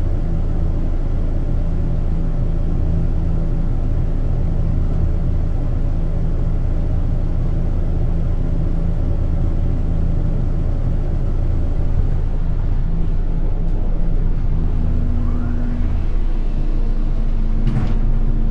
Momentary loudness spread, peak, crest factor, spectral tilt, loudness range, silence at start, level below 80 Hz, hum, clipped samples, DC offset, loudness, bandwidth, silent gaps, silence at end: 3 LU; -6 dBFS; 10 dB; -10 dB/octave; 1 LU; 0 s; -16 dBFS; none; under 0.1%; under 0.1%; -22 LUFS; 3.2 kHz; none; 0 s